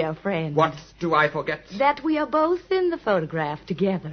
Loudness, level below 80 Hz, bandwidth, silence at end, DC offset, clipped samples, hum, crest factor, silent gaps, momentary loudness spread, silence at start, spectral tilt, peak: -24 LUFS; -56 dBFS; 6.6 kHz; 0 s; under 0.1%; under 0.1%; none; 18 dB; none; 7 LU; 0 s; -7 dB/octave; -6 dBFS